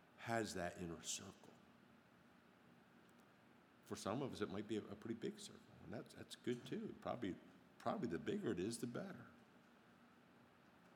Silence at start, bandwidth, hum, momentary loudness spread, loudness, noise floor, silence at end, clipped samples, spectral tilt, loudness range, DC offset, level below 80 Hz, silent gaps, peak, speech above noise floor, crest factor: 0 s; 19.5 kHz; none; 24 LU; -48 LUFS; -70 dBFS; 0 s; under 0.1%; -4.5 dB/octave; 7 LU; under 0.1%; -80 dBFS; none; -26 dBFS; 22 dB; 24 dB